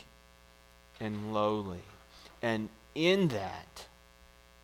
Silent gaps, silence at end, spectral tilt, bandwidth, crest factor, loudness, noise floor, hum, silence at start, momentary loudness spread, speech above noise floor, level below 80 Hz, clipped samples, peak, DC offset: none; 0.75 s; -6 dB/octave; 17 kHz; 20 dB; -33 LUFS; -60 dBFS; 60 Hz at -60 dBFS; 1 s; 25 LU; 27 dB; -62 dBFS; under 0.1%; -16 dBFS; under 0.1%